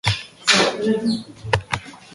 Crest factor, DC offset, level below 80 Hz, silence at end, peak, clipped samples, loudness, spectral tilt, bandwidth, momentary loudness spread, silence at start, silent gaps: 20 dB; under 0.1%; -44 dBFS; 0 s; 0 dBFS; under 0.1%; -20 LUFS; -3.5 dB/octave; 11.5 kHz; 12 LU; 0.05 s; none